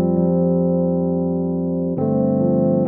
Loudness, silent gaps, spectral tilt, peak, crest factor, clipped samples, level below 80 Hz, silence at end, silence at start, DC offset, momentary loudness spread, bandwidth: -19 LUFS; none; -16 dB/octave; -6 dBFS; 10 dB; under 0.1%; -50 dBFS; 0 s; 0 s; under 0.1%; 4 LU; 1.9 kHz